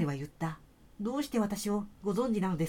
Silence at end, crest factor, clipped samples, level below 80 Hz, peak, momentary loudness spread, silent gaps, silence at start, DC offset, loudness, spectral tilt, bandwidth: 0 s; 14 dB; under 0.1%; -58 dBFS; -18 dBFS; 8 LU; none; 0 s; under 0.1%; -34 LUFS; -6.5 dB/octave; 17.5 kHz